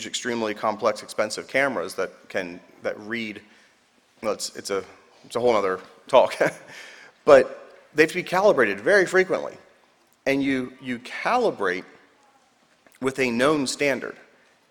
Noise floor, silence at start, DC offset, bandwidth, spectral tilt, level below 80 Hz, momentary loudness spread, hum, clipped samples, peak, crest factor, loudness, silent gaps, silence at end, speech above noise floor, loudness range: -61 dBFS; 0 s; under 0.1%; 18.5 kHz; -4 dB/octave; -62 dBFS; 14 LU; none; under 0.1%; -2 dBFS; 24 dB; -23 LUFS; none; 0.55 s; 38 dB; 8 LU